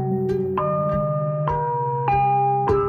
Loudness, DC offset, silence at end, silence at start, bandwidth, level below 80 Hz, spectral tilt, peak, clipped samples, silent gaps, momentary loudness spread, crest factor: -22 LUFS; under 0.1%; 0 s; 0 s; 6.2 kHz; -42 dBFS; -10 dB/octave; -8 dBFS; under 0.1%; none; 4 LU; 12 dB